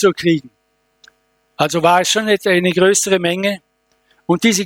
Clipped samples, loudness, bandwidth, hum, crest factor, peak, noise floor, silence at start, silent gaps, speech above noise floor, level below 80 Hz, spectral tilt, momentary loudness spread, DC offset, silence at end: under 0.1%; -15 LUFS; 17.5 kHz; none; 16 dB; 0 dBFS; -64 dBFS; 0 s; none; 49 dB; -58 dBFS; -3.5 dB/octave; 8 LU; under 0.1%; 0 s